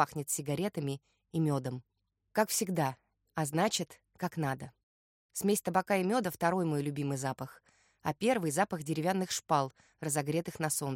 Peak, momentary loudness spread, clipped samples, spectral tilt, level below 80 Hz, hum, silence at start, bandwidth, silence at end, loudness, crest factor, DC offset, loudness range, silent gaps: -12 dBFS; 12 LU; under 0.1%; -4.5 dB/octave; -70 dBFS; none; 0 s; 16.5 kHz; 0 s; -33 LUFS; 22 dB; under 0.1%; 2 LU; 4.83-5.29 s